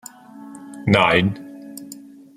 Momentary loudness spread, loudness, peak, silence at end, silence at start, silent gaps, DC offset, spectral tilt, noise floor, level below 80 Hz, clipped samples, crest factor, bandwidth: 25 LU; -18 LUFS; -2 dBFS; 0.45 s; 0.35 s; none; under 0.1%; -5.5 dB/octave; -41 dBFS; -56 dBFS; under 0.1%; 20 dB; 15.5 kHz